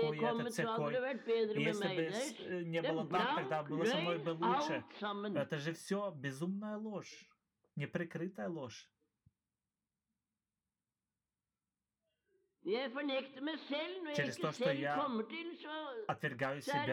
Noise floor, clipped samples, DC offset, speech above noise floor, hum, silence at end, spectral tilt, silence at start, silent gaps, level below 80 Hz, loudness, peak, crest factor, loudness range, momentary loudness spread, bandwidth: under -90 dBFS; under 0.1%; under 0.1%; over 51 dB; none; 0 s; -5.5 dB/octave; 0 s; none; -86 dBFS; -39 LUFS; -22 dBFS; 16 dB; 10 LU; 9 LU; 17 kHz